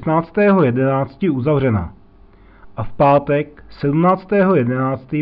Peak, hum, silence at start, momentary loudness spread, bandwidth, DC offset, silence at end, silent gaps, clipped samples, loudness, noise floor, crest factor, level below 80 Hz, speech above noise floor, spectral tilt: -4 dBFS; none; 0 s; 14 LU; 5.2 kHz; under 0.1%; 0 s; none; under 0.1%; -16 LUFS; -45 dBFS; 12 dB; -44 dBFS; 30 dB; -12 dB/octave